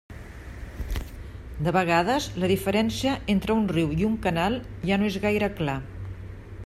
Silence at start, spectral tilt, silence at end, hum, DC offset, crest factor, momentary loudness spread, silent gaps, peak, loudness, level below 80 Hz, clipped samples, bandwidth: 0.1 s; -6 dB/octave; 0 s; none; under 0.1%; 18 dB; 18 LU; none; -8 dBFS; -25 LUFS; -40 dBFS; under 0.1%; 15 kHz